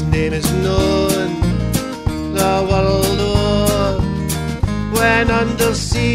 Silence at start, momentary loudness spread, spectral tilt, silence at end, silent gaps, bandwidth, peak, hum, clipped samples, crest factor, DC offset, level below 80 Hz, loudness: 0 s; 6 LU; -5 dB/octave; 0 s; none; 16 kHz; -2 dBFS; none; under 0.1%; 14 dB; under 0.1%; -26 dBFS; -16 LUFS